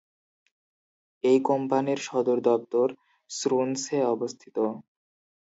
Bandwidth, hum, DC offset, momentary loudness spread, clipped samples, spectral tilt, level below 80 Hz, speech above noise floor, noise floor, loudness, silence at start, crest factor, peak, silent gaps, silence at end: 8 kHz; none; under 0.1%; 8 LU; under 0.1%; -5 dB/octave; -80 dBFS; over 65 dB; under -90 dBFS; -26 LUFS; 1.25 s; 18 dB; -10 dBFS; none; 0.75 s